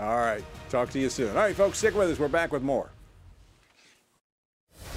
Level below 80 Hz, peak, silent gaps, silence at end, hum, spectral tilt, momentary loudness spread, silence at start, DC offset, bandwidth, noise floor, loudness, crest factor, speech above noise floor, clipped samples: -50 dBFS; -10 dBFS; 4.21-4.67 s; 0 s; none; -4.5 dB/octave; 8 LU; 0 s; under 0.1%; 16 kHz; -62 dBFS; -27 LUFS; 18 dB; 35 dB; under 0.1%